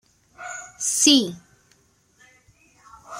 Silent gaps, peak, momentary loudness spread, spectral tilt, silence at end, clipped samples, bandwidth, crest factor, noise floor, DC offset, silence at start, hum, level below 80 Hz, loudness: none; -2 dBFS; 21 LU; -1 dB/octave; 0 s; under 0.1%; 16 kHz; 24 dB; -61 dBFS; under 0.1%; 0.4 s; none; -68 dBFS; -18 LUFS